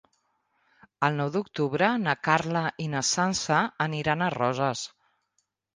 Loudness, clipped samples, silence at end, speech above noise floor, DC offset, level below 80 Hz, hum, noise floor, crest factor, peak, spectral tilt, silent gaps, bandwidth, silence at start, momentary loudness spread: -26 LUFS; under 0.1%; 0.9 s; 50 dB; under 0.1%; -64 dBFS; none; -76 dBFS; 22 dB; -6 dBFS; -4 dB/octave; none; 10 kHz; 1 s; 5 LU